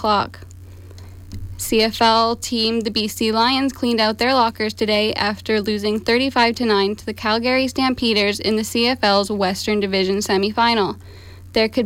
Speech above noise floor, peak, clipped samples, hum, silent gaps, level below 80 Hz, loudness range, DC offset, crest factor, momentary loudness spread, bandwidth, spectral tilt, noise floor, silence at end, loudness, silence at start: 20 dB; -4 dBFS; under 0.1%; none; none; -46 dBFS; 1 LU; under 0.1%; 14 dB; 6 LU; 16.5 kHz; -4 dB/octave; -38 dBFS; 0 s; -18 LUFS; 0 s